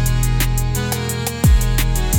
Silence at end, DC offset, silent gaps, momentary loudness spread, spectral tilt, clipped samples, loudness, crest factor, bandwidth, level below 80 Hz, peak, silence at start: 0 s; under 0.1%; none; 5 LU; -4.5 dB/octave; under 0.1%; -18 LUFS; 12 dB; 19 kHz; -18 dBFS; -4 dBFS; 0 s